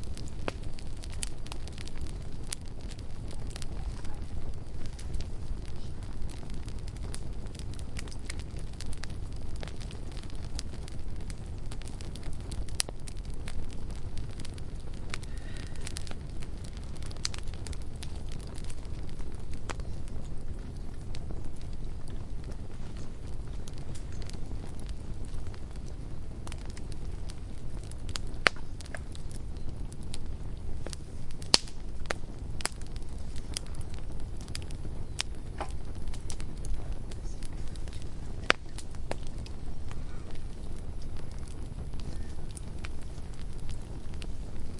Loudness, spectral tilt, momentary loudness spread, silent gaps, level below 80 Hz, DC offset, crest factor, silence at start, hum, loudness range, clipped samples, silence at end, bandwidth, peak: -39 LUFS; -3.5 dB/octave; 7 LU; none; -38 dBFS; under 0.1%; 32 dB; 0 s; none; 9 LU; under 0.1%; 0 s; 11.5 kHz; 0 dBFS